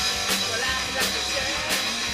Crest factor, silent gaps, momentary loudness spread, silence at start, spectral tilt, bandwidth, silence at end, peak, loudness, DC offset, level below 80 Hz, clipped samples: 16 dB; none; 1 LU; 0 s; -1 dB/octave; 15.5 kHz; 0 s; -10 dBFS; -23 LUFS; under 0.1%; -46 dBFS; under 0.1%